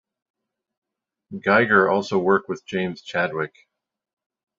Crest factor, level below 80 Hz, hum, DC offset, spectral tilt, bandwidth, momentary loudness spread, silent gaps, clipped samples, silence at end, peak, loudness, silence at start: 22 dB; -62 dBFS; none; under 0.1%; -6 dB/octave; 7.6 kHz; 13 LU; none; under 0.1%; 1.1 s; -2 dBFS; -21 LUFS; 1.3 s